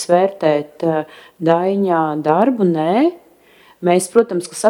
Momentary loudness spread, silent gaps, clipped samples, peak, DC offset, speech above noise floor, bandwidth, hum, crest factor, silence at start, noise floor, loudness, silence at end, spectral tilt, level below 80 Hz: 7 LU; none; under 0.1%; 0 dBFS; under 0.1%; 33 dB; 16.5 kHz; none; 16 dB; 0 s; -49 dBFS; -16 LUFS; 0 s; -6 dB/octave; -66 dBFS